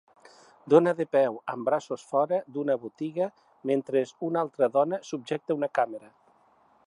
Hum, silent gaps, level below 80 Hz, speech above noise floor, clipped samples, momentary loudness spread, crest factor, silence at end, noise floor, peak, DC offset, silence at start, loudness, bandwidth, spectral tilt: none; none; -82 dBFS; 36 dB; under 0.1%; 11 LU; 22 dB; 0.9 s; -63 dBFS; -6 dBFS; under 0.1%; 0.65 s; -27 LUFS; 11 kHz; -6.5 dB/octave